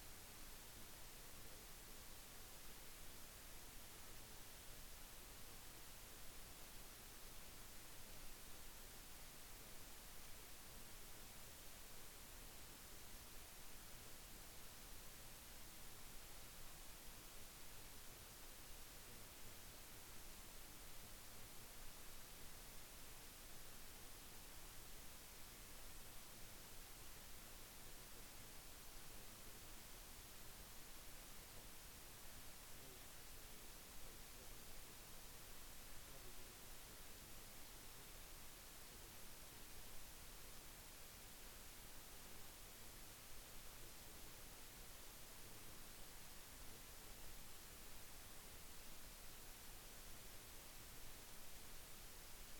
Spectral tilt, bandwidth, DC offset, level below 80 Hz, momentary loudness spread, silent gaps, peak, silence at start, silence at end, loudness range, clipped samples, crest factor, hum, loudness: -2 dB/octave; over 20 kHz; under 0.1%; -62 dBFS; 0 LU; none; -42 dBFS; 0 s; 0 s; 0 LU; under 0.1%; 14 dB; none; -58 LUFS